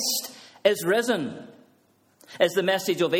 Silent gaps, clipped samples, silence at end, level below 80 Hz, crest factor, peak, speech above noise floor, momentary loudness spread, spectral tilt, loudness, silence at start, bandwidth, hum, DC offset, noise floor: none; under 0.1%; 0 s; -72 dBFS; 22 dB; -4 dBFS; 40 dB; 13 LU; -3 dB/octave; -24 LUFS; 0 s; 17 kHz; none; under 0.1%; -63 dBFS